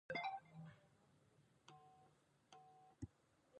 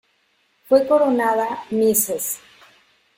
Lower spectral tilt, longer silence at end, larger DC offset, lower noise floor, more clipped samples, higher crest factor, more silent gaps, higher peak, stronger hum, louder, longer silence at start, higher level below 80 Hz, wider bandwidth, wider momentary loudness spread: first, -5.5 dB/octave vs -3.5 dB/octave; second, 0 s vs 0.8 s; neither; first, -76 dBFS vs -64 dBFS; neither; about the same, 22 dB vs 18 dB; neither; second, -34 dBFS vs -2 dBFS; neither; second, -53 LUFS vs -19 LUFS; second, 0.1 s vs 0.7 s; second, -76 dBFS vs -62 dBFS; second, 10 kHz vs 17 kHz; first, 21 LU vs 9 LU